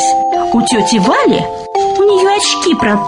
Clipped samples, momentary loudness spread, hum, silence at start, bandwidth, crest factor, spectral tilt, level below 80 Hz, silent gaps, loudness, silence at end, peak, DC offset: under 0.1%; 5 LU; none; 0 s; 11 kHz; 10 dB; -3.5 dB/octave; -44 dBFS; none; -11 LUFS; 0 s; -2 dBFS; under 0.1%